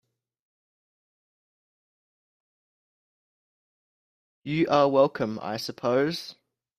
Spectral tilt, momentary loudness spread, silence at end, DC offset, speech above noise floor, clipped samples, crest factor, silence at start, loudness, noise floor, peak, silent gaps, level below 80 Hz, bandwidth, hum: -6 dB/octave; 14 LU; 0.45 s; under 0.1%; over 65 dB; under 0.1%; 22 dB; 4.45 s; -25 LUFS; under -90 dBFS; -8 dBFS; none; -70 dBFS; 15 kHz; none